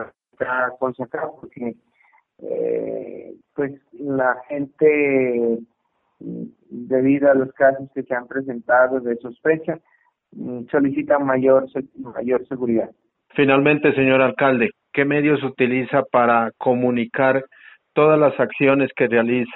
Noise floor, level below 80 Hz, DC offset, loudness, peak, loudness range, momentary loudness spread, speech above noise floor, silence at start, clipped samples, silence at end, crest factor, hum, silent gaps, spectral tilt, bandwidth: -69 dBFS; -62 dBFS; under 0.1%; -19 LUFS; -2 dBFS; 8 LU; 15 LU; 50 dB; 0 s; under 0.1%; 0 s; 18 dB; none; none; -5 dB/octave; 4.1 kHz